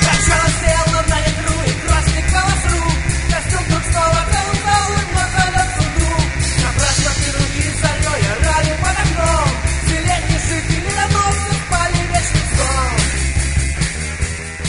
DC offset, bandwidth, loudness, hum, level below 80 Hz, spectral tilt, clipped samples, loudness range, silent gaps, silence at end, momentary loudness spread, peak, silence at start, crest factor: under 0.1%; 11 kHz; -16 LUFS; none; -22 dBFS; -3.5 dB/octave; under 0.1%; 1 LU; none; 0 s; 3 LU; 0 dBFS; 0 s; 16 dB